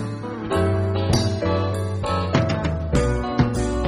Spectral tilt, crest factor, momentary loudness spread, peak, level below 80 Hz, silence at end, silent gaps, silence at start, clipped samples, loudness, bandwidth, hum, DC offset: -6.5 dB/octave; 16 dB; 4 LU; -4 dBFS; -32 dBFS; 0 s; none; 0 s; under 0.1%; -22 LUFS; 12.5 kHz; none; under 0.1%